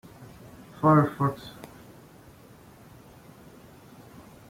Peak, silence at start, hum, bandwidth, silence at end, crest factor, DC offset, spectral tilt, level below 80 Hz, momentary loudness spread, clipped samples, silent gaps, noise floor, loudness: -8 dBFS; 0.2 s; none; 16 kHz; 3 s; 22 dB; under 0.1%; -8.5 dB/octave; -60 dBFS; 29 LU; under 0.1%; none; -51 dBFS; -24 LUFS